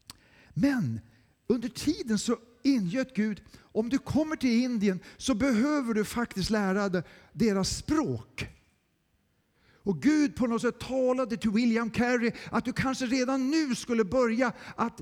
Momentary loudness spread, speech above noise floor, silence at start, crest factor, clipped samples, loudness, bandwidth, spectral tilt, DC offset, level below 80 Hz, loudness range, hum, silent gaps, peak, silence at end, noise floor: 8 LU; 44 dB; 0.55 s; 16 dB; under 0.1%; -29 LUFS; 16 kHz; -5.5 dB/octave; under 0.1%; -54 dBFS; 3 LU; none; none; -12 dBFS; 0 s; -72 dBFS